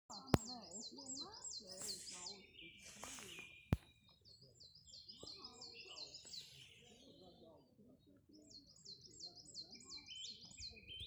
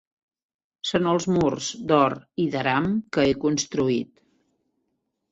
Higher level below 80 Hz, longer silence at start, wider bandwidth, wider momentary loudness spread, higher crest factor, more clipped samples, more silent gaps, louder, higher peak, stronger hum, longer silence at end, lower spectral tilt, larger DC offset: second, -64 dBFS vs -54 dBFS; second, 0.1 s vs 0.85 s; first, over 20 kHz vs 8.2 kHz; first, 20 LU vs 7 LU; first, 40 dB vs 18 dB; neither; neither; second, -49 LUFS vs -23 LUFS; second, -12 dBFS vs -6 dBFS; neither; second, 0 s vs 1.25 s; second, -3.5 dB/octave vs -5 dB/octave; neither